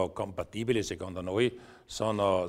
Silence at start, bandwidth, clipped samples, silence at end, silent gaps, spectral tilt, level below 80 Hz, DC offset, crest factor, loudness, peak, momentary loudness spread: 0 s; 15 kHz; under 0.1%; 0 s; none; -5.5 dB/octave; -58 dBFS; under 0.1%; 18 dB; -32 LUFS; -12 dBFS; 8 LU